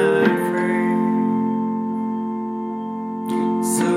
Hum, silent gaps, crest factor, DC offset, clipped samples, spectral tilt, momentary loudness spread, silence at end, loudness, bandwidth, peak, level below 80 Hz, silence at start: none; none; 18 dB; under 0.1%; under 0.1%; -5.5 dB/octave; 9 LU; 0 s; -21 LUFS; 16 kHz; -4 dBFS; -74 dBFS; 0 s